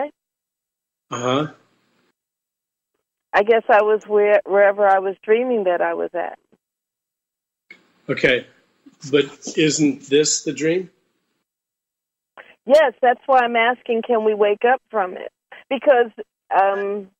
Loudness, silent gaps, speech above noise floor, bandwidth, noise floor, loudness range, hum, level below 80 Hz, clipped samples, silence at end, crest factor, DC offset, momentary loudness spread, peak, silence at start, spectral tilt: -18 LUFS; none; 67 dB; 8.8 kHz; -85 dBFS; 7 LU; none; -64 dBFS; under 0.1%; 0.15 s; 16 dB; under 0.1%; 12 LU; -4 dBFS; 0 s; -3.5 dB/octave